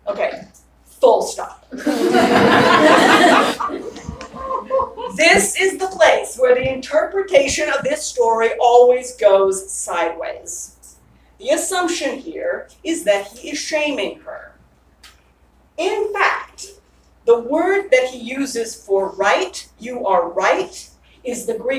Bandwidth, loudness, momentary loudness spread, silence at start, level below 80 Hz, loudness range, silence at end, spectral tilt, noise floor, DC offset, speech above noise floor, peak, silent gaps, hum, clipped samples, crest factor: 16 kHz; -17 LUFS; 18 LU; 0.05 s; -50 dBFS; 9 LU; 0 s; -3 dB/octave; -54 dBFS; under 0.1%; 35 dB; 0 dBFS; none; none; under 0.1%; 18 dB